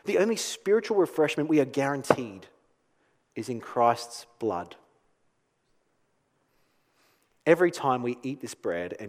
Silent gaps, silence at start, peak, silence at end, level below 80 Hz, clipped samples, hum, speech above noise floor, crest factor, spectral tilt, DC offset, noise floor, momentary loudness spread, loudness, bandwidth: none; 0.05 s; -2 dBFS; 0 s; -74 dBFS; under 0.1%; none; 45 dB; 26 dB; -5 dB/octave; under 0.1%; -72 dBFS; 13 LU; -27 LUFS; 16 kHz